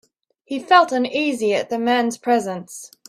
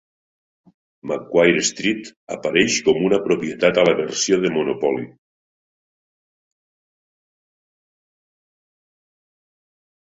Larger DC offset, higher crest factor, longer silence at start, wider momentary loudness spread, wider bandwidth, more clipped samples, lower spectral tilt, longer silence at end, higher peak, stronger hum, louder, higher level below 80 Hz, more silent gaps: neither; about the same, 20 dB vs 22 dB; second, 0.5 s vs 1.05 s; first, 15 LU vs 12 LU; first, 15 kHz vs 8 kHz; neither; about the same, -3.5 dB/octave vs -3.5 dB/octave; second, 0.25 s vs 5 s; about the same, 0 dBFS vs 0 dBFS; neither; about the same, -19 LUFS vs -19 LUFS; second, -68 dBFS vs -60 dBFS; second, none vs 2.16-2.27 s